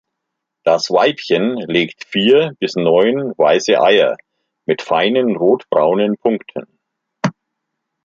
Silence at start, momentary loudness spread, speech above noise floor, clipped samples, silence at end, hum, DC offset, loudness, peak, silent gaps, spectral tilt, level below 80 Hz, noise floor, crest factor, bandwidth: 0.65 s; 11 LU; 63 dB; under 0.1%; 0.75 s; none; under 0.1%; -15 LUFS; -2 dBFS; none; -5 dB/octave; -64 dBFS; -78 dBFS; 14 dB; 7.6 kHz